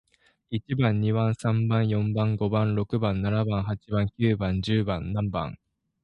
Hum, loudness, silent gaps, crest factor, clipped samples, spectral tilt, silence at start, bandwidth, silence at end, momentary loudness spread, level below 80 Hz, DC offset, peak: none; -26 LUFS; none; 18 dB; under 0.1%; -8.5 dB/octave; 0.5 s; 9.6 kHz; 0.5 s; 6 LU; -46 dBFS; under 0.1%; -8 dBFS